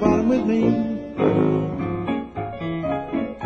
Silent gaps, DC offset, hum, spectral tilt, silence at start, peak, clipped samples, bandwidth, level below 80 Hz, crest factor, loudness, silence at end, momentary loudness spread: none; under 0.1%; none; -8.5 dB/octave; 0 s; -4 dBFS; under 0.1%; 6.8 kHz; -46 dBFS; 18 dB; -22 LUFS; 0 s; 8 LU